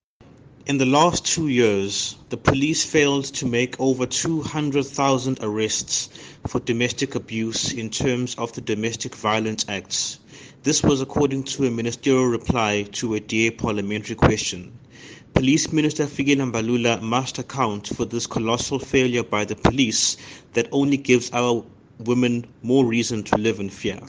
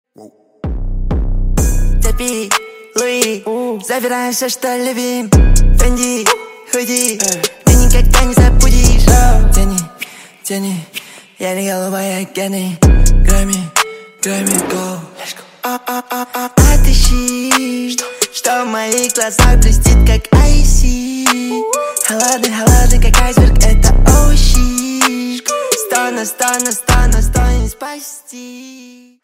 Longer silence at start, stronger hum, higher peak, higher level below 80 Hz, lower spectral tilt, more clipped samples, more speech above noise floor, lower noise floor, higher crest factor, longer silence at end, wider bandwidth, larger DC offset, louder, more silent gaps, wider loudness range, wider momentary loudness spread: first, 0.65 s vs 0.2 s; neither; about the same, 0 dBFS vs 0 dBFS; second, -46 dBFS vs -12 dBFS; about the same, -4 dB/octave vs -4 dB/octave; neither; first, 28 dB vs 20 dB; first, -50 dBFS vs -31 dBFS; first, 22 dB vs 10 dB; second, 0 s vs 0.4 s; second, 10.5 kHz vs 16.5 kHz; neither; second, -22 LUFS vs -13 LUFS; neither; about the same, 3 LU vs 5 LU; second, 8 LU vs 12 LU